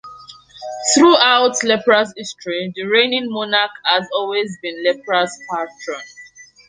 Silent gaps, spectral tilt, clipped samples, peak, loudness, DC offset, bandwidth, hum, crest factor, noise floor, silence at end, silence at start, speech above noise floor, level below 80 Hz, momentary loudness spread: none; -2 dB/octave; under 0.1%; 0 dBFS; -16 LUFS; under 0.1%; 10 kHz; none; 18 dB; -42 dBFS; 0.25 s; 0.05 s; 26 dB; -64 dBFS; 17 LU